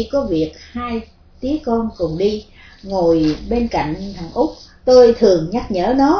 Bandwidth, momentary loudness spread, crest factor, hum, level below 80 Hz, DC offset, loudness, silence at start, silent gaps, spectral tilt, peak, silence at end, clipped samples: 5.4 kHz; 16 LU; 16 dB; none; -36 dBFS; under 0.1%; -17 LUFS; 0 s; none; -6.5 dB/octave; 0 dBFS; 0 s; under 0.1%